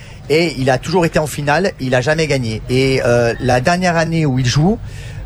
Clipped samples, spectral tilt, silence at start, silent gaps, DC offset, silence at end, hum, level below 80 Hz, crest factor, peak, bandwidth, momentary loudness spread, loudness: under 0.1%; -5.5 dB/octave; 0 s; none; under 0.1%; 0 s; none; -34 dBFS; 14 dB; 0 dBFS; 14.5 kHz; 4 LU; -15 LUFS